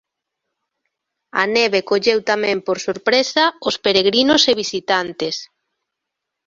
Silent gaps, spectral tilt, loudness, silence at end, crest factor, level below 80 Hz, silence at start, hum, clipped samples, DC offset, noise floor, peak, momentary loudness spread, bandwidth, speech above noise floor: none; -2.5 dB/octave; -17 LUFS; 1 s; 18 dB; -60 dBFS; 1.35 s; none; under 0.1%; under 0.1%; -81 dBFS; -2 dBFS; 9 LU; 7.8 kHz; 63 dB